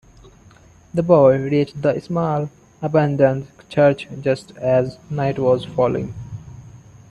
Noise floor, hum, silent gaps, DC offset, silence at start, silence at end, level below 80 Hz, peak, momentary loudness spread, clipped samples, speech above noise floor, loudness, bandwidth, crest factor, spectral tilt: -48 dBFS; none; none; under 0.1%; 0.95 s; 0.35 s; -50 dBFS; 0 dBFS; 14 LU; under 0.1%; 30 dB; -19 LUFS; 10.5 kHz; 18 dB; -8.5 dB/octave